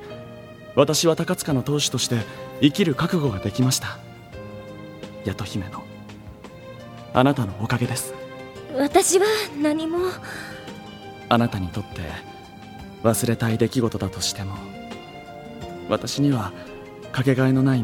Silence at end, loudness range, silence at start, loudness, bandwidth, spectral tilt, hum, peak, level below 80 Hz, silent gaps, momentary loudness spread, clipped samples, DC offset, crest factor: 0 s; 6 LU; 0 s; -22 LUFS; 18 kHz; -5 dB/octave; none; -2 dBFS; -50 dBFS; none; 20 LU; under 0.1%; under 0.1%; 22 dB